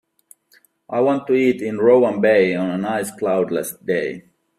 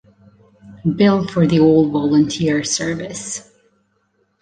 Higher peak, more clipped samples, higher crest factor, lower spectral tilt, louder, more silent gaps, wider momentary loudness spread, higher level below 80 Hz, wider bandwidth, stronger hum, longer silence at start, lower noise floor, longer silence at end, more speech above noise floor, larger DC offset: about the same, -2 dBFS vs -2 dBFS; neither; about the same, 16 dB vs 16 dB; about the same, -6 dB/octave vs -5.5 dB/octave; about the same, -19 LUFS vs -17 LUFS; neither; second, 9 LU vs 13 LU; second, -64 dBFS vs -50 dBFS; first, 15 kHz vs 9.6 kHz; neither; first, 0.9 s vs 0.65 s; second, -57 dBFS vs -64 dBFS; second, 0.4 s vs 1 s; second, 39 dB vs 49 dB; neither